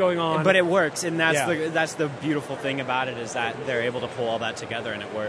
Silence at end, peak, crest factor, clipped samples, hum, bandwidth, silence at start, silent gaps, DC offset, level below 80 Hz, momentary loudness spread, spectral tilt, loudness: 0 s; -4 dBFS; 20 dB; under 0.1%; none; 11 kHz; 0 s; none; under 0.1%; -64 dBFS; 9 LU; -4.5 dB/octave; -24 LUFS